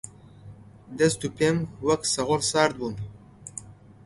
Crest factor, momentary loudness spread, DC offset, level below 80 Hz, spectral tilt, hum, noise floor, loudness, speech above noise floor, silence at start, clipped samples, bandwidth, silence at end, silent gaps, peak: 22 dB; 18 LU; under 0.1%; -56 dBFS; -4 dB/octave; none; -47 dBFS; -25 LUFS; 22 dB; 0.05 s; under 0.1%; 11.5 kHz; 0.35 s; none; -6 dBFS